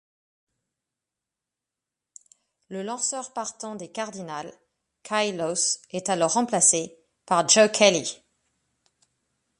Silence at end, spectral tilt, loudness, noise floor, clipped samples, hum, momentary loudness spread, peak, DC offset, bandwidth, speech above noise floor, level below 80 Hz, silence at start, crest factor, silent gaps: 1.45 s; -2 dB/octave; -23 LUFS; -88 dBFS; under 0.1%; none; 18 LU; -2 dBFS; under 0.1%; 11.5 kHz; 63 dB; -74 dBFS; 2.7 s; 24 dB; none